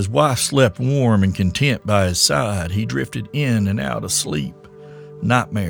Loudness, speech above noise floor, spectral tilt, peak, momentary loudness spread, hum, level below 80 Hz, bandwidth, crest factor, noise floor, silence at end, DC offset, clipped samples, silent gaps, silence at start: -18 LUFS; 21 dB; -4.5 dB/octave; 0 dBFS; 9 LU; none; -44 dBFS; over 20 kHz; 18 dB; -39 dBFS; 0 s; under 0.1%; under 0.1%; none; 0 s